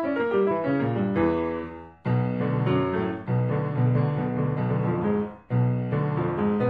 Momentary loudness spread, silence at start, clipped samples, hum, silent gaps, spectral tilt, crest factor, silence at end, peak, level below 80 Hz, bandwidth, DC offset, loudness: 5 LU; 0 s; under 0.1%; none; none; -11 dB/octave; 14 dB; 0 s; -10 dBFS; -52 dBFS; 4.8 kHz; under 0.1%; -25 LUFS